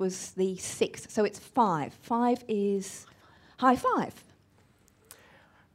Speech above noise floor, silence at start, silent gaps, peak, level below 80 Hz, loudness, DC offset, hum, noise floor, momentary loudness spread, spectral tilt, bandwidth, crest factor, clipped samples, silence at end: 34 dB; 0 s; none; -10 dBFS; -68 dBFS; -29 LUFS; under 0.1%; none; -63 dBFS; 8 LU; -5 dB/octave; 16 kHz; 20 dB; under 0.1%; 1.55 s